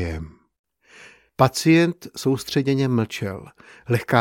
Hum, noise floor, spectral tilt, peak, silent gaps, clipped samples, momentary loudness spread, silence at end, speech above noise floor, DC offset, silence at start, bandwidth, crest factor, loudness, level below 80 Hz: none; -49 dBFS; -6 dB/octave; 0 dBFS; 0.59-0.64 s; under 0.1%; 20 LU; 0 s; 28 dB; under 0.1%; 0 s; 17 kHz; 22 dB; -21 LUFS; -46 dBFS